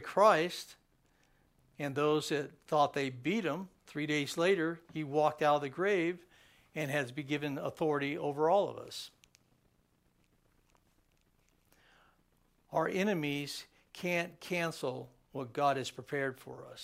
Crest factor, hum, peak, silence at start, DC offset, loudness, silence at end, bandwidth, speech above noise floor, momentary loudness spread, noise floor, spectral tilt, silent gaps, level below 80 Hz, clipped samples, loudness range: 22 dB; none; -12 dBFS; 0 s; under 0.1%; -34 LUFS; 0 s; 16 kHz; 39 dB; 15 LU; -73 dBFS; -5 dB/octave; none; -76 dBFS; under 0.1%; 6 LU